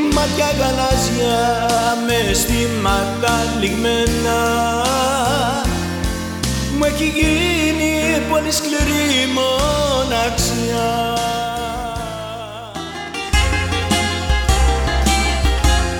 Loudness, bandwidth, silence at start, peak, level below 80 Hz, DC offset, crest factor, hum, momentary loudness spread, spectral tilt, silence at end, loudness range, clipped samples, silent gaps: -17 LUFS; 18.5 kHz; 0 s; -2 dBFS; -24 dBFS; under 0.1%; 14 dB; none; 7 LU; -4 dB/octave; 0 s; 4 LU; under 0.1%; none